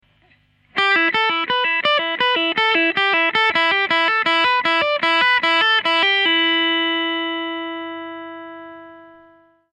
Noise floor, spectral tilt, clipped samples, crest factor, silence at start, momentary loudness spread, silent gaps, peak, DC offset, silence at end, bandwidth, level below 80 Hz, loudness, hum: -57 dBFS; -3 dB/octave; under 0.1%; 14 dB; 0.75 s; 14 LU; none; -6 dBFS; under 0.1%; 0.65 s; 9.4 kHz; -64 dBFS; -16 LUFS; 50 Hz at -65 dBFS